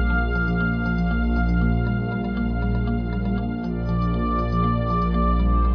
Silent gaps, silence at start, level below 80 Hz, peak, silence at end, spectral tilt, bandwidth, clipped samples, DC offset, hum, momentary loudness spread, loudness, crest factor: none; 0 s; -24 dBFS; -8 dBFS; 0 s; -10 dB/octave; 5.4 kHz; under 0.1%; under 0.1%; none; 4 LU; -23 LUFS; 12 dB